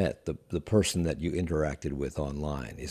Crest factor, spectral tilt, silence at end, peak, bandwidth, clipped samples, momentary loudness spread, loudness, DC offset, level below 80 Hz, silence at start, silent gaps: 18 dB; -5.5 dB/octave; 0 s; -12 dBFS; 14 kHz; under 0.1%; 9 LU; -31 LUFS; under 0.1%; -44 dBFS; 0 s; none